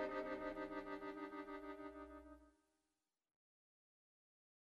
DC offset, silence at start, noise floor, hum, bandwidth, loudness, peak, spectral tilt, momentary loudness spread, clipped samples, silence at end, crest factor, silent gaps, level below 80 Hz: under 0.1%; 0 s; under -90 dBFS; none; 13 kHz; -50 LUFS; -34 dBFS; -6 dB/octave; 13 LU; under 0.1%; 2.15 s; 18 dB; none; -72 dBFS